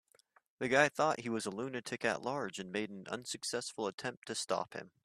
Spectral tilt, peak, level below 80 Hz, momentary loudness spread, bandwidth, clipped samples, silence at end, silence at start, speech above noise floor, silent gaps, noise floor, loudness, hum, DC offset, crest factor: -3.5 dB/octave; -12 dBFS; -78 dBFS; 12 LU; 15.5 kHz; under 0.1%; 0.15 s; 0.6 s; 33 dB; 3.94-3.98 s, 4.17-4.22 s; -70 dBFS; -36 LUFS; none; under 0.1%; 24 dB